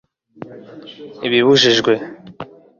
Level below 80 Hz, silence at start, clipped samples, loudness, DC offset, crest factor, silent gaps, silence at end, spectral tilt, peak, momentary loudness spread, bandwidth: -60 dBFS; 0.4 s; under 0.1%; -14 LUFS; under 0.1%; 16 dB; none; 0.35 s; -4 dB/octave; -2 dBFS; 25 LU; 7.4 kHz